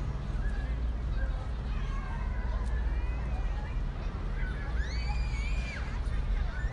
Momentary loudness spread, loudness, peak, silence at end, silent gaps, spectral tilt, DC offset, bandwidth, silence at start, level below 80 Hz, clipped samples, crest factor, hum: 3 LU; -35 LUFS; -20 dBFS; 0 s; none; -6.5 dB/octave; under 0.1%; 9.4 kHz; 0 s; -32 dBFS; under 0.1%; 12 dB; none